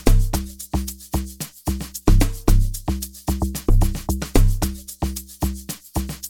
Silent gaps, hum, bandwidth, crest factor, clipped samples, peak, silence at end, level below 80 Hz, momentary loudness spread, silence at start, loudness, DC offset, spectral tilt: none; none; 18 kHz; 18 dB; under 0.1%; -2 dBFS; 0 s; -22 dBFS; 8 LU; 0 s; -24 LUFS; under 0.1%; -5.5 dB/octave